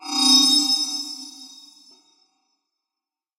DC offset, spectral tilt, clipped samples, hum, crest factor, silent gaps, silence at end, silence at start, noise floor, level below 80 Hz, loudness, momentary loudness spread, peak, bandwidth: under 0.1%; 1.5 dB/octave; under 0.1%; none; 20 dB; none; 1.9 s; 0 s; -89 dBFS; -78 dBFS; -16 LUFS; 21 LU; -4 dBFS; 16 kHz